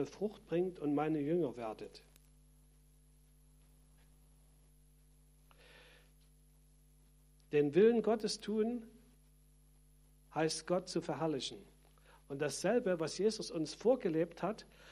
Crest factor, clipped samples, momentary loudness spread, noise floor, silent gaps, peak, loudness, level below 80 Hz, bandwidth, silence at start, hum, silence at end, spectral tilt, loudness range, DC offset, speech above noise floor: 20 dB; under 0.1%; 13 LU; -65 dBFS; none; -18 dBFS; -36 LUFS; -66 dBFS; 13 kHz; 0 s; 50 Hz at -65 dBFS; 0 s; -5.5 dB/octave; 7 LU; under 0.1%; 30 dB